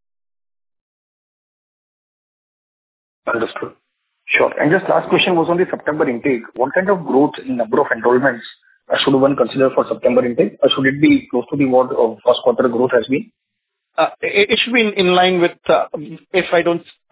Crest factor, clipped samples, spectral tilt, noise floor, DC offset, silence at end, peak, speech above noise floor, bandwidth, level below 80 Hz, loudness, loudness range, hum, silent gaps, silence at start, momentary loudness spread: 16 dB; under 0.1%; -9.5 dB/octave; -77 dBFS; under 0.1%; 0.3 s; 0 dBFS; 61 dB; 4 kHz; -58 dBFS; -16 LUFS; 6 LU; none; none; 3.25 s; 8 LU